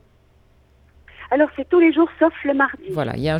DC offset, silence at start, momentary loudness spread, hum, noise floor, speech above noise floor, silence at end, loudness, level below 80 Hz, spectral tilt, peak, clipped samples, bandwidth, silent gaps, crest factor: under 0.1%; 1.2 s; 8 LU; none; -55 dBFS; 37 dB; 0 s; -19 LUFS; -50 dBFS; -8 dB/octave; -4 dBFS; under 0.1%; 5.4 kHz; none; 16 dB